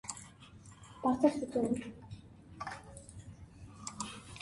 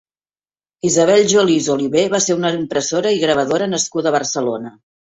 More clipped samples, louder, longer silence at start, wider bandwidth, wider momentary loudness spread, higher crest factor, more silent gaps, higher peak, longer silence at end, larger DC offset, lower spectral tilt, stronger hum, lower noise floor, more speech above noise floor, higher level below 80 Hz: neither; second, -36 LUFS vs -16 LUFS; second, 0.05 s vs 0.85 s; first, 11.5 kHz vs 8.2 kHz; first, 23 LU vs 9 LU; first, 24 dB vs 16 dB; neither; second, -14 dBFS vs -2 dBFS; second, 0 s vs 0.35 s; neither; first, -5 dB/octave vs -3.5 dB/octave; neither; second, -55 dBFS vs under -90 dBFS; second, 23 dB vs over 74 dB; about the same, -62 dBFS vs -58 dBFS